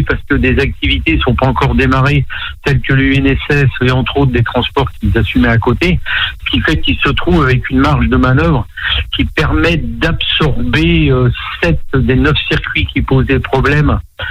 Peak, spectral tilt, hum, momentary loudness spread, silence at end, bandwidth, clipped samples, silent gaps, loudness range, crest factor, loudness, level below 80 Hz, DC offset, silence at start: 0 dBFS; -7 dB/octave; none; 4 LU; 0 s; 10.5 kHz; under 0.1%; none; 1 LU; 10 dB; -12 LUFS; -20 dBFS; under 0.1%; 0 s